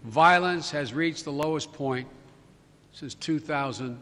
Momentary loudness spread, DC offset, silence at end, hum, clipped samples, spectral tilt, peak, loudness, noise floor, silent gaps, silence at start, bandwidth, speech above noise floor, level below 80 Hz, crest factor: 17 LU; under 0.1%; 0 s; none; under 0.1%; -4.5 dB/octave; -6 dBFS; -26 LUFS; -57 dBFS; none; 0 s; 13 kHz; 30 dB; -64 dBFS; 20 dB